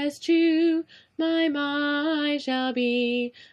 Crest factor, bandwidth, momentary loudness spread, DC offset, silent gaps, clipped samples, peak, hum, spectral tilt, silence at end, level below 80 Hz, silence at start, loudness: 12 dB; 10.5 kHz; 8 LU; under 0.1%; none; under 0.1%; -12 dBFS; none; -3.5 dB/octave; 0.25 s; -78 dBFS; 0 s; -24 LUFS